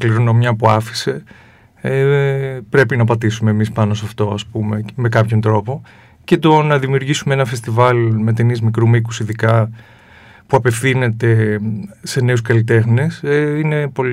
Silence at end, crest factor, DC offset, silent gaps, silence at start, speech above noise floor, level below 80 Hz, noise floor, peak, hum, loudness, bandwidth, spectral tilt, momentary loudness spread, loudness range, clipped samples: 0 s; 14 dB; under 0.1%; none; 0 s; 29 dB; -52 dBFS; -43 dBFS; 0 dBFS; none; -15 LUFS; 13 kHz; -6.5 dB/octave; 8 LU; 2 LU; under 0.1%